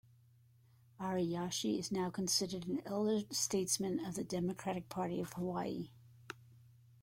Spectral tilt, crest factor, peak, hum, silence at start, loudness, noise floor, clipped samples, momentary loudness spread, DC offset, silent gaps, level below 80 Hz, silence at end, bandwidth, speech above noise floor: -4 dB/octave; 18 dB; -22 dBFS; none; 1 s; -38 LUFS; -67 dBFS; under 0.1%; 11 LU; under 0.1%; none; -70 dBFS; 0.4 s; 16.5 kHz; 29 dB